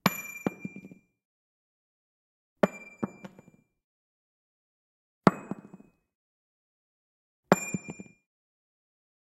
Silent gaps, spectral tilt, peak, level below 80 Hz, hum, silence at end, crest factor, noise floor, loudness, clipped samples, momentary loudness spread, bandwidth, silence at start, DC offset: 1.25-2.56 s, 3.84-5.21 s, 6.15-7.43 s; -5.5 dB/octave; -2 dBFS; -72 dBFS; none; 1.2 s; 32 dB; -59 dBFS; -30 LUFS; under 0.1%; 22 LU; 16 kHz; 0.05 s; under 0.1%